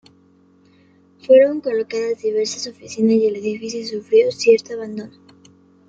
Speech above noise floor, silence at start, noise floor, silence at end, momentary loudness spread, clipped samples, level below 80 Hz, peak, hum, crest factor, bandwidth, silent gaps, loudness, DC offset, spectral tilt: 36 dB; 1.3 s; -53 dBFS; 0.8 s; 16 LU; under 0.1%; -68 dBFS; -2 dBFS; none; 18 dB; 8 kHz; none; -18 LUFS; under 0.1%; -4.5 dB/octave